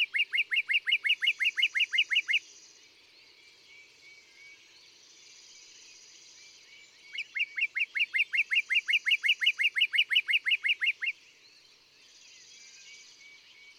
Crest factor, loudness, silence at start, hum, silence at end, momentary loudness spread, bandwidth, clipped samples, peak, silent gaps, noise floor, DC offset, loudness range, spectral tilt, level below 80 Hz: 18 dB; -26 LUFS; 0 s; none; 0.75 s; 12 LU; 14 kHz; under 0.1%; -14 dBFS; none; -60 dBFS; under 0.1%; 11 LU; 4 dB/octave; -90 dBFS